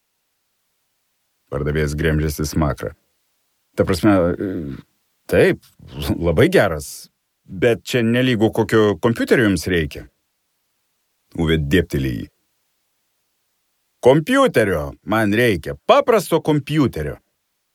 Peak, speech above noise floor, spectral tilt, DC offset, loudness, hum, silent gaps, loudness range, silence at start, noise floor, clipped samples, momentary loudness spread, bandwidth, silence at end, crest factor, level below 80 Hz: 0 dBFS; 53 dB; -6 dB/octave; under 0.1%; -18 LUFS; none; none; 7 LU; 1.5 s; -71 dBFS; under 0.1%; 15 LU; 18.5 kHz; 0.6 s; 18 dB; -38 dBFS